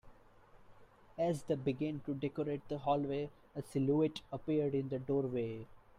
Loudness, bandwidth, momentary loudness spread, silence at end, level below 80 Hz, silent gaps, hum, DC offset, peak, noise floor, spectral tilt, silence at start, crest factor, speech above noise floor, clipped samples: -37 LUFS; 14 kHz; 9 LU; 0.2 s; -66 dBFS; none; none; under 0.1%; -22 dBFS; -62 dBFS; -8 dB/octave; 0.05 s; 16 dB; 25 dB; under 0.1%